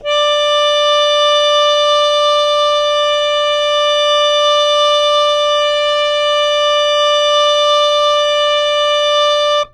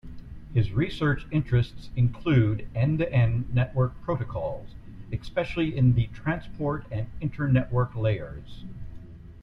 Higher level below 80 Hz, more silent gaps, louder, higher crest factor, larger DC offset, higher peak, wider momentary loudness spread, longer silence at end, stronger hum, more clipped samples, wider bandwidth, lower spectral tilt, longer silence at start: second, -48 dBFS vs -42 dBFS; neither; first, -12 LUFS vs -27 LUFS; second, 10 dB vs 18 dB; neither; first, -4 dBFS vs -10 dBFS; second, 2 LU vs 20 LU; about the same, 0.05 s vs 0 s; neither; neither; first, 11.5 kHz vs 5.4 kHz; second, 2 dB/octave vs -9 dB/octave; about the same, 0 s vs 0.05 s